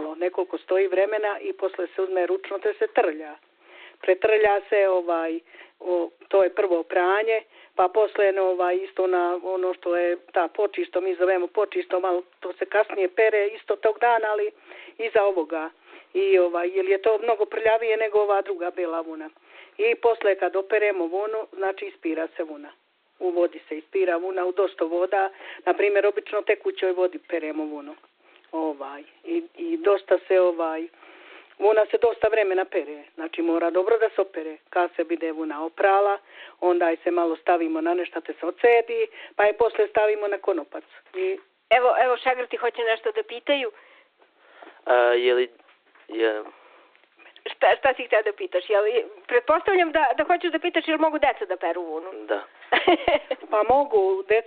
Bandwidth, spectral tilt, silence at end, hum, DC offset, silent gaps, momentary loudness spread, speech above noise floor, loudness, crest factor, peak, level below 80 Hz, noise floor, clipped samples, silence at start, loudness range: 4.5 kHz; -0.5 dB/octave; 0.05 s; none; under 0.1%; none; 11 LU; 35 dB; -23 LUFS; 18 dB; -6 dBFS; -64 dBFS; -59 dBFS; under 0.1%; 0 s; 3 LU